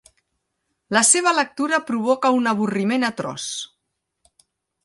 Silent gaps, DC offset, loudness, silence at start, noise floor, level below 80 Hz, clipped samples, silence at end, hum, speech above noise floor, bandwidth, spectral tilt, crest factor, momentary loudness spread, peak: none; under 0.1%; -19 LUFS; 0.9 s; -77 dBFS; -70 dBFS; under 0.1%; 1.2 s; none; 57 dB; 11.5 kHz; -2.5 dB/octave; 20 dB; 13 LU; -2 dBFS